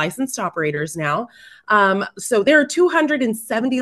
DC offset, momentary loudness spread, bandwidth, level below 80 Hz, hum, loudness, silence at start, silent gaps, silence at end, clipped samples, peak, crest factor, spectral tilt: under 0.1%; 9 LU; 12.5 kHz; -64 dBFS; none; -18 LUFS; 0 s; none; 0 s; under 0.1%; -2 dBFS; 18 dB; -4 dB/octave